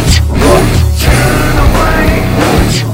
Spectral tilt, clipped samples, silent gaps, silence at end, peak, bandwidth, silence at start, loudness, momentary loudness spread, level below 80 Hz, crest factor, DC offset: -5 dB/octave; 3%; none; 0 s; 0 dBFS; 16.5 kHz; 0 s; -9 LUFS; 2 LU; -12 dBFS; 8 dB; under 0.1%